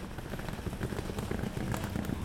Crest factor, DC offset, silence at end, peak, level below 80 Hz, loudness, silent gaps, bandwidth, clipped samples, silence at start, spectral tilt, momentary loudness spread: 18 dB; under 0.1%; 0 s; -18 dBFS; -44 dBFS; -37 LUFS; none; 17 kHz; under 0.1%; 0 s; -6 dB/octave; 5 LU